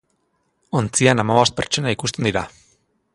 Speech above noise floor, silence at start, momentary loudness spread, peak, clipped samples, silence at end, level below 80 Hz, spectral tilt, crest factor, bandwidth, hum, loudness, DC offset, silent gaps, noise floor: 49 dB; 0.75 s; 9 LU; 0 dBFS; under 0.1%; 0.65 s; -50 dBFS; -4 dB/octave; 20 dB; 11.5 kHz; none; -19 LUFS; under 0.1%; none; -68 dBFS